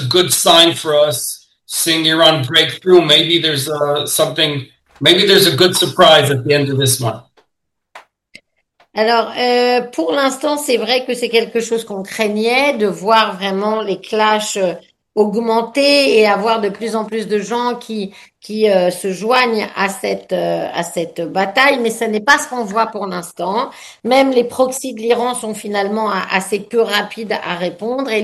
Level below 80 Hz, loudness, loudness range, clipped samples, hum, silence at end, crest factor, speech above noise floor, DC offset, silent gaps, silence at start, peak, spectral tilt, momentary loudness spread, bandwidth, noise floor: -58 dBFS; -14 LUFS; 6 LU; under 0.1%; none; 0 s; 16 dB; 60 dB; under 0.1%; none; 0 s; 0 dBFS; -3.5 dB/octave; 12 LU; 16 kHz; -75 dBFS